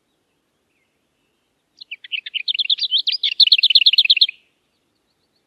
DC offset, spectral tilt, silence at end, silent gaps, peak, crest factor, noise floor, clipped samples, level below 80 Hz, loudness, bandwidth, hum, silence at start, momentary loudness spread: under 0.1%; 4 dB/octave; 1.2 s; none; 0 dBFS; 20 dB; -68 dBFS; under 0.1%; -84 dBFS; -14 LUFS; 13.5 kHz; none; 1.9 s; 17 LU